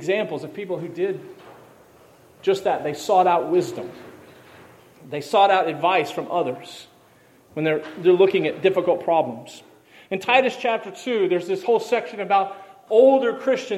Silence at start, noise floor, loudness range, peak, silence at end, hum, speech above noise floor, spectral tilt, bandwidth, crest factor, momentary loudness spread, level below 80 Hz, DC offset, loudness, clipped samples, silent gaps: 0 s; -54 dBFS; 3 LU; -2 dBFS; 0 s; none; 33 dB; -5 dB/octave; 14 kHz; 20 dB; 16 LU; -72 dBFS; under 0.1%; -21 LUFS; under 0.1%; none